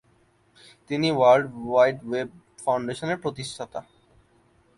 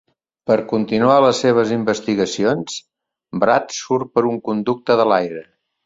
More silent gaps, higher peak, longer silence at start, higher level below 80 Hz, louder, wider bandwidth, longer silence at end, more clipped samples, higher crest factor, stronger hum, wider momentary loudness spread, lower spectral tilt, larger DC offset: neither; second, -6 dBFS vs -2 dBFS; first, 0.9 s vs 0.45 s; about the same, -62 dBFS vs -60 dBFS; second, -24 LUFS vs -18 LUFS; first, 11.5 kHz vs 7.8 kHz; first, 0.95 s vs 0.45 s; neither; about the same, 20 dB vs 16 dB; neither; first, 17 LU vs 13 LU; about the same, -5.5 dB/octave vs -5 dB/octave; neither